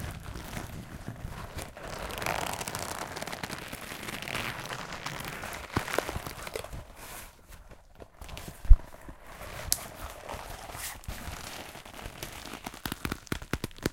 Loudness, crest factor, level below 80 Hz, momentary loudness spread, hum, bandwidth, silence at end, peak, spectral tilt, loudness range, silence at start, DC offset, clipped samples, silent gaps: -36 LUFS; 32 dB; -34 dBFS; 14 LU; none; 17 kHz; 0 s; 0 dBFS; -3.5 dB/octave; 5 LU; 0 s; under 0.1%; under 0.1%; none